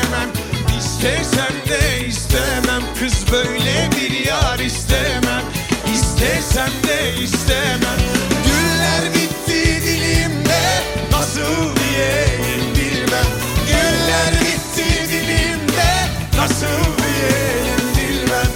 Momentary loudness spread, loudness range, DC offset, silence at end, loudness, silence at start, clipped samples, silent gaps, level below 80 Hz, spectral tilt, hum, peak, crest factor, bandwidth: 4 LU; 1 LU; under 0.1%; 0 s; -16 LUFS; 0 s; under 0.1%; none; -26 dBFS; -4 dB/octave; none; -2 dBFS; 14 dB; 17 kHz